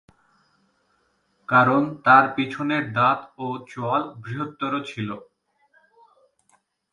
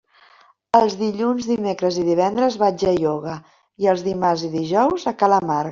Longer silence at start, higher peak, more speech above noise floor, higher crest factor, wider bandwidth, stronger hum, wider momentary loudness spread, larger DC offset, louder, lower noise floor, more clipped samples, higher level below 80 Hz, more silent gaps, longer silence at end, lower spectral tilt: first, 1.5 s vs 0.75 s; about the same, -2 dBFS vs -2 dBFS; first, 46 dB vs 34 dB; about the same, 22 dB vs 18 dB; first, 11 kHz vs 7.6 kHz; neither; first, 16 LU vs 5 LU; neither; about the same, -22 LUFS vs -20 LUFS; first, -67 dBFS vs -53 dBFS; neither; second, -68 dBFS vs -56 dBFS; neither; first, 1.75 s vs 0 s; about the same, -7 dB/octave vs -6 dB/octave